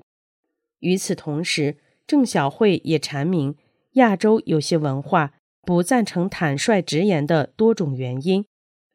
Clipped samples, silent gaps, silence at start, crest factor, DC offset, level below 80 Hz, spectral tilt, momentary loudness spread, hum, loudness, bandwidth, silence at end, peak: under 0.1%; 5.39-5.63 s; 0.8 s; 18 dB; under 0.1%; -62 dBFS; -5.5 dB/octave; 7 LU; none; -21 LUFS; 15.5 kHz; 0.5 s; -2 dBFS